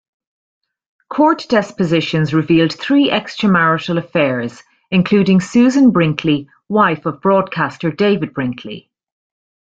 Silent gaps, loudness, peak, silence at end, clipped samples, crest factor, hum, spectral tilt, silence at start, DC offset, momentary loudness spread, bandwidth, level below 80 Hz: none; -15 LUFS; -2 dBFS; 0.9 s; under 0.1%; 14 dB; none; -6.5 dB/octave; 1.1 s; under 0.1%; 9 LU; 7.8 kHz; -54 dBFS